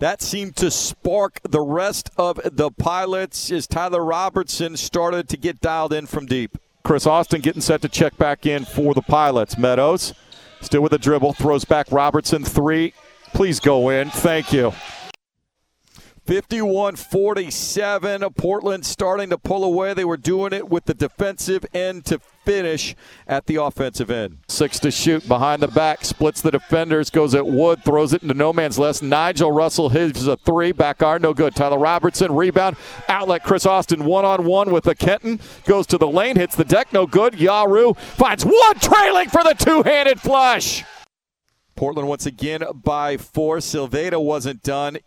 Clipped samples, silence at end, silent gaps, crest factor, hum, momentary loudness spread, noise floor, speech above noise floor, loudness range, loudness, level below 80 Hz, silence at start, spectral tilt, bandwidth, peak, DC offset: under 0.1%; 0.05 s; none; 18 dB; none; 9 LU; -74 dBFS; 56 dB; 8 LU; -18 LUFS; -42 dBFS; 0 s; -4.5 dB/octave; 18 kHz; 0 dBFS; under 0.1%